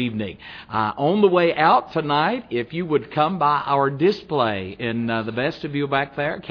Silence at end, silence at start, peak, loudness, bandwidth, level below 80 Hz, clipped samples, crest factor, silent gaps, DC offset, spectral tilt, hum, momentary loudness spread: 0 s; 0 s; -2 dBFS; -21 LUFS; 5.4 kHz; -56 dBFS; under 0.1%; 18 dB; none; under 0.1%; -8 dB/octave; none; 10 LU